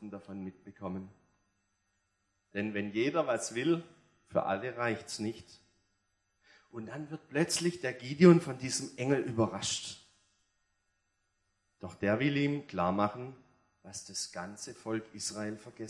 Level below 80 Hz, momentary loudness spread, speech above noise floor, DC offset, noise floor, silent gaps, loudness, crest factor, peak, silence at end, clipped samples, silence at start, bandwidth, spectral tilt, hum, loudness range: -74 dBFS; 16 LU; 47 dB; under 0.1%; -79 dBFS; none; -32 LUFS; 26 dB; -10 dBFS; 0 s; under 0.1%; 0 s; 12 kHz; -5 dB/octave; 50 Hz at -70 dBFS; 8 LU